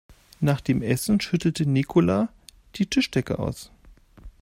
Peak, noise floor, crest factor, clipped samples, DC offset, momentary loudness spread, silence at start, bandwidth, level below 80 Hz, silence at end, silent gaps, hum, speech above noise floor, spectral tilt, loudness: -8 dBFS; -51 dBFS; 18 dB; under 0.1%; under 0.1%; 9 LU; 0.4 s; 16 kHz; -48 dBFS; 0.15 s; none; none; 28 dB; -6 dB/octave; -24 LUFS